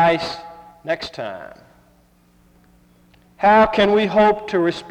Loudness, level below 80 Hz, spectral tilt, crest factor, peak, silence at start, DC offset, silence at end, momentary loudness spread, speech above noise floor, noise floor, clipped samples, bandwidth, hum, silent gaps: -17 LUFS; -50 dBFS; -6 dB/octave; 16 dB; -4 dBFS; 0 s; under 0.1%; 0 s; 20 LU; 38 dB; -55 dBFS; under 0.1%; 10.5 kHz; none; none